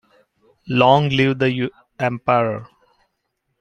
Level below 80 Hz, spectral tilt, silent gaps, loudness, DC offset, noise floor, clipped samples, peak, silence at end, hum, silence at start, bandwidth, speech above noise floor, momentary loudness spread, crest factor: -56 dBFS; -7 dB/octave; none; -18 LUFS; under 0.1%; -73 dBFS; under 0.1%; -2 dBFS; 0.95 s; none; 0.65 s; 7.2 kHz; 56 dB; 11 LU; 20 dB